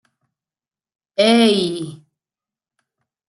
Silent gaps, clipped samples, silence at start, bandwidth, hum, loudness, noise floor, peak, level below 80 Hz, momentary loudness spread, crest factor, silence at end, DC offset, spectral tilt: none; under 0.1%; 1.2 s; 12 kHz; none; -15 LUFS; under -90 dBFS; -2 dBFS; -66 dBFS; 16 LU; 18 dB; 1.3 s; under 0.1%; -4.5 dB/octave